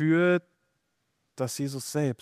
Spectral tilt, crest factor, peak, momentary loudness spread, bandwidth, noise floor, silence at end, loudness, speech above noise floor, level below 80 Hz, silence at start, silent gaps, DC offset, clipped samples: -6 dB/octave; 16 dB; -12 dBFS; 10 LU; 15.5 kHz; -77 dBFS; 0.05 s; -28 LUFS; 51 dB; -74 dBFS; 0 s; none; under 0.1%; under 0.1%